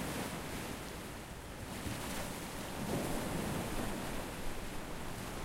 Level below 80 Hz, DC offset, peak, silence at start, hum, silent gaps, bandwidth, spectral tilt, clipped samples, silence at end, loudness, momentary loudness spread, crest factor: -48 dBFS; under 0.1%; -26 dBFS; 0 s; none; none; 16 kHz; -4.5 dB/octave; under 0.1%; 0 s; -41 LUFS; 7 LU; 16 dB